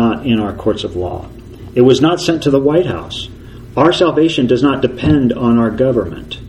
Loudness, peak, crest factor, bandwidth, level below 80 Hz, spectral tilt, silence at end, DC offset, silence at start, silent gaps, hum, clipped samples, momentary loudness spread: -14 LUFS; 0 dBFS; 14 dB; 12 kHz; -36 dBFS; -6.5 dB/octave; 0 s; under 0.1%; 0 s; none; none; under 0.1%; 13 LU